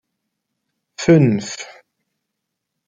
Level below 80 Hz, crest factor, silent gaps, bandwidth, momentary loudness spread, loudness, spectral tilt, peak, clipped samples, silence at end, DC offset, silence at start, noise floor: -56 dBFS; 18 dB; none; 9.2 kHz; 19 LU; -16 LUFS; -6.5 dB/octave; -2 dBFS; under 0.1%; 1.25 s; under 0.1%; 1 s; -79 dBFS